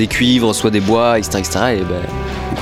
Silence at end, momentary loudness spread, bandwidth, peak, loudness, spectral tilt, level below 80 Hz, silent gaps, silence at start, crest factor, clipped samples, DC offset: 0 s; 9 LU; 16 kHz; -2 dBFS; -15 LUFS; -4.5 dB/octave; -32 dBFS; none; 0 s; 14 dB; under 0.1%; under 0.1%